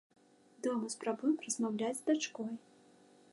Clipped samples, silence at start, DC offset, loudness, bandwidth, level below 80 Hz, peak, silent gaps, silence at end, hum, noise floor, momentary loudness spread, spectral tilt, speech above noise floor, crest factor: under 0.1%; 0.6 s; under 0.1%; -36 LUFS; 11.5 kHz; under -90 dBFS; -20 dBFS; none; 0.75 s; none; -64 dBFS; 9 LU; -3.5 dB/octave; 28 dB; 16 dB